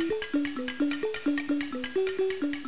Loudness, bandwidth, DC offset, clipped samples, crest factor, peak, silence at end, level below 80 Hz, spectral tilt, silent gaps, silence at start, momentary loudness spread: -30 LUFS; 4 kHz; 0.6%; under 0.1%; 12 dB; -18 dBFS; 0 s; -62 dBFS; -2.5 dB/octave; none; 0 s; 2 LU